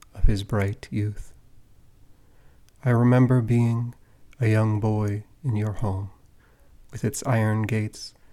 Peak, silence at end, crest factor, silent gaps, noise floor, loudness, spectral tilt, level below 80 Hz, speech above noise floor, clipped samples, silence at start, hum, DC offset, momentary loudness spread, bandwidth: -6 dBFS; 0.25 s; 18 dB; none; -54 dBFS; -24 LUFS; -7.5 dB/octave; -36 dBFS; 31 dB; under 0.1%; 0.15 s; none; under 0.1%; 14 LU; 13.5 kHz